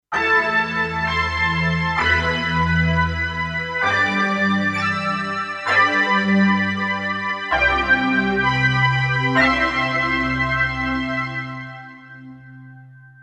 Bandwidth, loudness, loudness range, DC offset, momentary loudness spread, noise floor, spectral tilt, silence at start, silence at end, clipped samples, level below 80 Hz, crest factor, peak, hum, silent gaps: 9.8 kHz; -18 LUFS; 3 LU; under 0.1%; 7 LU; -43 dBFS; -5.5 dB/octave; 0.1 s; 0.15 s; under 0.1%; -38 dBFS; 16 dB; -4 dBFS; none; none